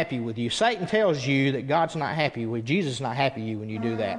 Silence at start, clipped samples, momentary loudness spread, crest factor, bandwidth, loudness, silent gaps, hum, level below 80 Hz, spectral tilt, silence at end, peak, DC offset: 0 s; under 0.1%; 7 LU; 18 dB; 11 kHz; -26 LUFS; none; none; -62 dBFS; -5.5 dB/octave; 0 s; -8 dBFS; under 0.1%